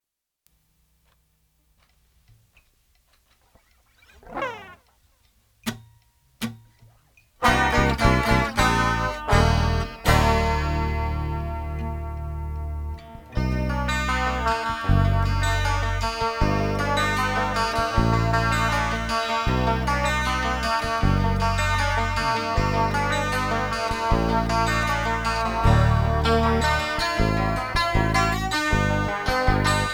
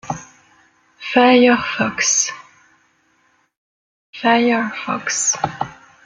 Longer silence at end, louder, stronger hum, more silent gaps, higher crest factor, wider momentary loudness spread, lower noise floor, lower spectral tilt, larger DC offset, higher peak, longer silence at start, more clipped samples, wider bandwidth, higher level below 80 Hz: second, 0 s vs 0.35 s; second, -23 LUFS vs -16 LUFS; neither; second, none vs 3.57-4.13 s; about the same, 20 dB vs 18 dB; second, 12 LU vs 17 LU; first, -70 dBFS vs -61 dBFS; first, -5 dB/octave vs -2.5 dB/octave; neither; about the same, -2 dBFS vs -2 dBFS; first, 4.25 s vs 0.05 s; neither; first, 18 kHz vs 10 kHz; first, -30 dBFS vs -58 dBFS